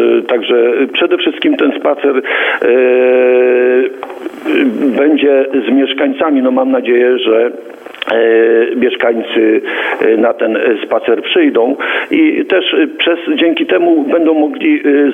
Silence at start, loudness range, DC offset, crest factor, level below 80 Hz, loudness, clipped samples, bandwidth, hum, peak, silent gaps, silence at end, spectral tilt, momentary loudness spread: 0 s; 1 LU; under 0.1%; 10 dB; -66 dBFS; -11 LUFS; under 0.1%; 3.9 kHz; none; 0 dBFS; none; 0 s; -6 dB/octave; 4 LU